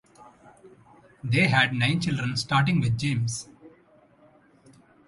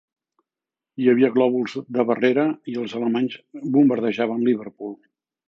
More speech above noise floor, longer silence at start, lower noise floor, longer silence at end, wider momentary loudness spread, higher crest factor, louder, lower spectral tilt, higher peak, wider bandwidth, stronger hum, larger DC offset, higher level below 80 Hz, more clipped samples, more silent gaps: second, 34 dB vs 68 dB; second, 0.2 s vs 1 s; second, -58 dBFS vs -89 dBFS; first, 1.4 s vs 0.55 s; about the same, 13 LU vs 14 LU; about the same, 22 dB vs 18 dB; second, -24 LUFS vs -21 LUFS; second, -5 dB/octave vs -7.5 dB/octave; about the same, -6 dBFS vs -4 dBFS; first, 11.5 kHz vs 7 kHz; neither; neither; first, -56 dBFS vs -74 dBFS; neither; neither